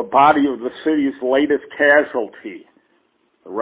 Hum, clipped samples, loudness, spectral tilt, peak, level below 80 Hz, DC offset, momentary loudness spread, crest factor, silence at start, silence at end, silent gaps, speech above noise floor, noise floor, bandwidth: none; under 0.1%; -17 LUFS; -8.5 dB/octave; -2 dBFS; -60 dBFS; under 0.1%; 17 LU; 18 dB; 0 s; 0 s; none; 46 dB; -62 dBFS; 4 kHz